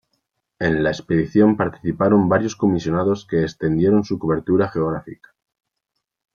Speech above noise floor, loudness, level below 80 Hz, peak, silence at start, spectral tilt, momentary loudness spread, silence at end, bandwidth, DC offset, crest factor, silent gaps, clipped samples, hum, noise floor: 60 dB; -19 LUFS; -50 dBFS; -2 dBFS; 0.6 s; -7.5 dB/octave; 7 LU; 1.2 s; 7.2 kHz; under 0.1%; 16 dB; none; under 0.1%; none; -78 dBFS